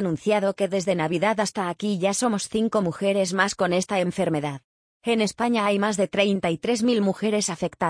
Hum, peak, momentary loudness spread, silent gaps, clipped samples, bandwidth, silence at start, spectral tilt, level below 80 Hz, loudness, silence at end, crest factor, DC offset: none; -6 dBFS; 4 LU; 4.64-5.01 s; under 0.1%; 10.5 kHz; 0 s; -4.5 dB/octave; -60 dBFS; -24 LUFS; 0 s; 18 dB; under 0.1%